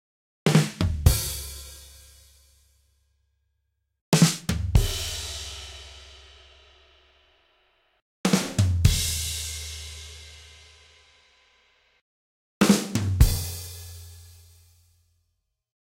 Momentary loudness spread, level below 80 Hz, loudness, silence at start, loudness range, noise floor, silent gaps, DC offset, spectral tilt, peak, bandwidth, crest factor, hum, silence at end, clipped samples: 23 LU; -34 dBFS; -24 LUFS; 0.45 s; 7 LU; -77 dBFS; 4.01-4.12 s, 8.02-8.24 s, 12.01-12.61 s; under 0.1%; -4.5 dB/octave; -2 dBFS; 16 kHz; 24 dB; none; 1.75 s; under 0.1%